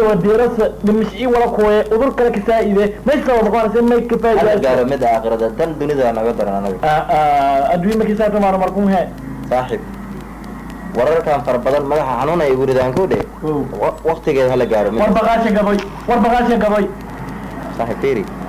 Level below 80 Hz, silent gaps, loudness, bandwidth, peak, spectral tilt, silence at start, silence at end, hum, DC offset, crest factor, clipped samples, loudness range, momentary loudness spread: -36 dBFS; none; -15 LUFS; 16 kHz; -6 dBFS; -7 dB/octave; 0 s; 0 s; none; under 0.1%; 8 dB; under 0.1%; 4 LU; 10 LU